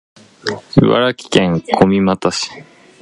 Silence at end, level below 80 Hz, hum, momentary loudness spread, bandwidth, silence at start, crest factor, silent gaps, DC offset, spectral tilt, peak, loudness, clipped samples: 0.4 s; -42 dBFS; none; 12 LU; 11 kHz; 0.45 s; 16 dB; none; under 0.1%; -5.5 dB/octave; 0 dBFS; -15 LUFS; under 0.1%